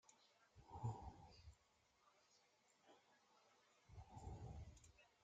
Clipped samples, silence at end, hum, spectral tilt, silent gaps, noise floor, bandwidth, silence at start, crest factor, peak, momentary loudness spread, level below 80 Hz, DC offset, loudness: under 0.1%; 0 s; none; -6 dB/octave; none; -80 dBFS; 8.8 kHz; 0.05 s; 24 dB; -36 dBFS; 16 LU; -68 dBFS; under 0.1%; -57 LUFS